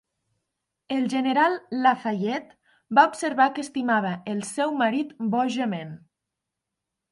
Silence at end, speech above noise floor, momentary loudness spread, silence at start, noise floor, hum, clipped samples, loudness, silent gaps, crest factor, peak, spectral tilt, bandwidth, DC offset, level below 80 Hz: 1.15 s; 61 dB; 10 LU; 0.9 s; -85 dBFS; none; under 0.1%; -24 LUFS; none; 22 dB; -4 dBFS; -5 dB/octave; 11.5 kHz; under 0.1%; -76 dBFS